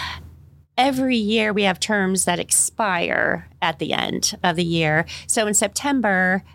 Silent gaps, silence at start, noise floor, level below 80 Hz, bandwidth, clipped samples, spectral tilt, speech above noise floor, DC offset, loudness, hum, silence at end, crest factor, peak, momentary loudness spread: none; 0 s; -47 dBFS; -50 dBFS; 17 kHz; under 0.1%; -3 dB/octave; 26 dB; under 0.1%; -20 LUFS; none; 0.15 s; 20 dB; 0 dBFS; 6 LU